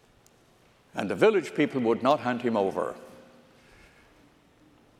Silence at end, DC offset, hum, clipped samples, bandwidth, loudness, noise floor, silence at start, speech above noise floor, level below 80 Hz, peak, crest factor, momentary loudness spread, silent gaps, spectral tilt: 1.85 s; under 0.1%; none; under 0.1%; 13.5 kHz; -26 LUFS; -61 dBFS; 0.95 s; 35 dB; -70 dBFS; -8 dBFS; 22 dB; 12 LU; none; -6 dB/octave